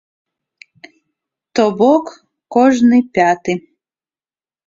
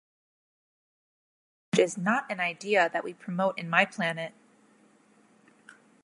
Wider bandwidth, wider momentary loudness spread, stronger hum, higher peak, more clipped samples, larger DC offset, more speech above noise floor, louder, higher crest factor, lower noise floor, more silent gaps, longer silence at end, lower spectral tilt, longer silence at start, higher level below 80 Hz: second, 7.6 kHz vs 11.5 kHz; about the same, 11 LU vs 10 LU; neither; first, -2 dBFS vs -6 dBFS; neither; neither; first, over 78 dB vs 34 dB; first, -14 LUFS vs -28 LUFS; second, 16 dB vs 26 dB; first, under -90 dBFS vs -62 dBFS; neither; second, 1.1 s vs 1.75 s; about the same, -5.5 dB/octave vs -4.5 dB/octave; second, 1.55 s vs 1.75 s; first, -58 dBFS vs -82 dBFS